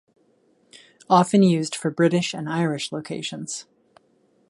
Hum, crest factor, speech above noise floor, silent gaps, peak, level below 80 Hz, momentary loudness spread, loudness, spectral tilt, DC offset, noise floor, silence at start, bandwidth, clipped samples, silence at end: none; 20 dB; 41 dB; none; -2 dBFS; -70 dBFS; 13 LU; -22 LUFS; -5.5 dB/octave; under 0.1%; -63 dBFS; 0.75 s; 11.5 kHz; under 0.1%; 0.85 s